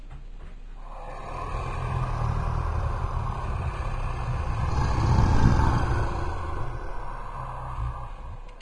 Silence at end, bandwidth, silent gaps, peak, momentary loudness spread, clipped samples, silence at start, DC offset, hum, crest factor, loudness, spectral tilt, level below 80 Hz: 0 s; 10.5 kHz; none; -4 dBFS; 20 LU; under 0.1%; 0 s; 0.3%; none; 22 dB; -29 LUFS; -7 dB/octave; -30 dBFS